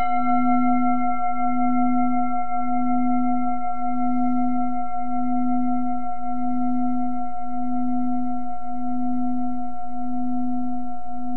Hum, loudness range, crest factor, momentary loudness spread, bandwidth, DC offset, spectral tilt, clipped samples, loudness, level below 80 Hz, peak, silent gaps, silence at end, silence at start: none; 5 LU; 14 dB; 9 LU; 3.1 kHz; 10%; -10 dB/octave; under 0.1%; -25 LUFS; -52 dBFS; -8 dBFS; none; 0 s; 0 s